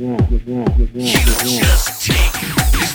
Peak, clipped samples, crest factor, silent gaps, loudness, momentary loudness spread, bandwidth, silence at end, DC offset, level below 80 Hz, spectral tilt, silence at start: 0 dBFS; under 0.1%; 14 dB; none; -15 LUFS; 4 LU; over 20 kHz; 0 s; under 0.1%; -16 dBFS; -4 dB/octave; 0 s